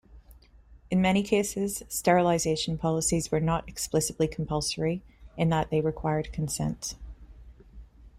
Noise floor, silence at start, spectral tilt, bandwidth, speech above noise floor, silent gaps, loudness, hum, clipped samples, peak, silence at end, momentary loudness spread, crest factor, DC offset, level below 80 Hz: -54 dBFS; 0.1 s; -5 dB/octave; 16 kHz; 27 dB; none; -28 LUFS; none; under 0.1%; -8 dBFS; 0.1 s; 8 LU; 20 dB; under 0.1%; -48 dBFS